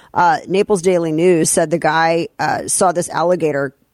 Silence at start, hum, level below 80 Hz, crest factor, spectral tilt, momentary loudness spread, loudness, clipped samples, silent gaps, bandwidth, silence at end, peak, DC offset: 0.15 s; none; -54 dBFS; 14 dB; -4 dB/octave; 5 LU; -15 LUFS; under 0.1%; none; 15.5 kHz; 0.25 s; -2 dBFS; under 0.1%